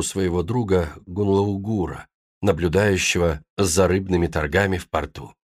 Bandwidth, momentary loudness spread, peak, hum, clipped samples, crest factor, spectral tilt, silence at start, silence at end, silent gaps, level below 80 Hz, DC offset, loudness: 15.5 kHz; 8 LU; -6 dBFS; none; under 0.1%; 16 dB; -5 dB/octave; 0 s; 0.25 s; 2.14-2.41 s, 3.50-3.57 s; -40 dBFS; under 0.1%; -22 LUFS